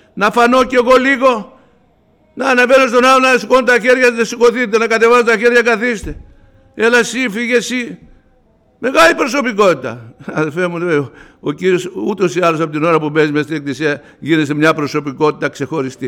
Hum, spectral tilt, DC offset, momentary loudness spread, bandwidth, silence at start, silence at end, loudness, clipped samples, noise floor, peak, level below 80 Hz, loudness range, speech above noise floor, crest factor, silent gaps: none; -4.5 dB/octave; under 0.1%; 11 LU; 16 kHz; 0.15 s; 0 s; -13 LUFS; under 0.1%; -53 dBFS; -2 dBFS; -44 dBFS; 6 LU; 40 dB; 12 dB; none